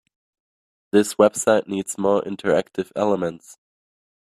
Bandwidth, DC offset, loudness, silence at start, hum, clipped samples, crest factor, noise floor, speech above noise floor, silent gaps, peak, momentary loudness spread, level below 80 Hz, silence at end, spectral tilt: 15 kHz; under 0.1%; -21 LUFS; 0.95 s; none; under 0.1%; 20 dB; under -90 dBFS; over 70 dB; none; -2 dBFS; 9 LU; -64 dBFS; 0.85 s; -4.5 dB/octave